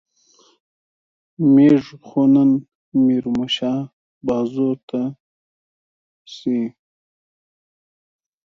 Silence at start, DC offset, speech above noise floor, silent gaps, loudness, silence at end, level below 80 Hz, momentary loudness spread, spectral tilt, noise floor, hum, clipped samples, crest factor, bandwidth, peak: 1.4 s; under 0.1%; 39 dB; 2.75-2.92 s, 3.93-4.21 s, 4.83-4.88 s, 5.20-6.25 s; -19 LUFS; 1.75 s; -60 dBFS; 15 LU; -7.5 dB/octave; -56 dBFS; none; under 0.1%; 18 dB; 7 kHz; -4 dBFS